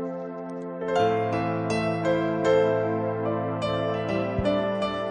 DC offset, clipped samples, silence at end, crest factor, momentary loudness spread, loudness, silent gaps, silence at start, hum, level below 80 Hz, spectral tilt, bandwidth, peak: under 0.1%; under 0.1%; 0 s; 14 dB; 10 LU; -26 LUFS; none; 0 s; none; -50 dBFS; -7 dB/octave; 9.6 kHz; -10 dBFS